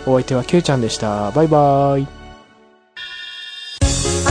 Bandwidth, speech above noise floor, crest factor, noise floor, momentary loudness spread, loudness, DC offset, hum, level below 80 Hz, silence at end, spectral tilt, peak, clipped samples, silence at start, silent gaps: 10.5 kHz; 35 dB; 16 dB; -50 dBFS; 16 LU; -16 LUFS; under 0.1%; none; -32 dBFS; 0 s; -5 dB/octave; -2 dBFS; under 0.1%; 0 s; none